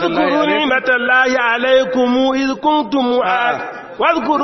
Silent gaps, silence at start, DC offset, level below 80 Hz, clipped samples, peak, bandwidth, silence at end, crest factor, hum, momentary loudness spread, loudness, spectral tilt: none; 0 s; under 0.1%; -52 dBFS; under 0.1%; 0 dBFS; 6.2 kHz; 0 s; 14 dB; none; 4 LU; -14 LUFS; -1 dB/octave